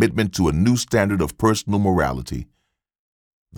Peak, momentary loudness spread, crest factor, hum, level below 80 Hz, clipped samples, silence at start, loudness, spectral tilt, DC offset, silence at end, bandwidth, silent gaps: -4 dBFS; 9 LU; 16 dB; none; -38 dBFS; under 0.1%; 0 s; -20 LUFS; -5.5 dB/octave; under 0.1%; 0 s; 18.5 kHz; 2.99-3.46 s